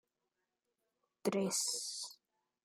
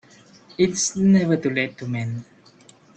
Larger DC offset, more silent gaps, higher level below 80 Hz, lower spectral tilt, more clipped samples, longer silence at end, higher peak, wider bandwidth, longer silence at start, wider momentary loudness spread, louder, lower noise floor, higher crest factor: neither; neither; second, -88 dBFS vs -58 dBFS; second, -3 dB/octave vs -5 dB/octave; neither; second, 0.5 s vs 0.75 s; second, -22 dBFS vs -6 dBFS; first, 16 kHz vs 8.8 kHz; first, 1.25 s vs 0.6 s; second, 10 LU vs 14 LU; second, -37 LUFS vs -21 LUFS; first, -88 dBFS vs -52 dBFS; about the same, 20 dB vs 16 dB